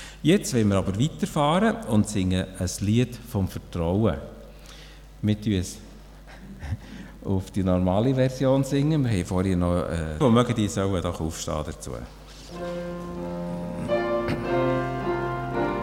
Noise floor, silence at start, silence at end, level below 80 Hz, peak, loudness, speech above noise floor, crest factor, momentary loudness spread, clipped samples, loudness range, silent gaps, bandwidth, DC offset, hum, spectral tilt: -44 dBFS; 0 s; 0 s; -42 dBFS; -8 dBFS; -25 LUFS; 21 dB; 18 dB; 16 LU; under 0.1%; 7 LU; none; 16.5 kHz; under 0.1%; none; -6.5 dB/octave